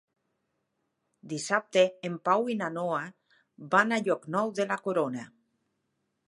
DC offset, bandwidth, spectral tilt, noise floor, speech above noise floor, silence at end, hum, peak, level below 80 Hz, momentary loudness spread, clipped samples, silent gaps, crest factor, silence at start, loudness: under 0.1%; 11.5 kHz; -4.5 dB/octave; -79 dBFS; 51 dB; 1.05 s; none; -8 dBFS; -82 dBFS; 10 LU; under 0.1%; none; 22 dB; 1.25 s; -28 LUFS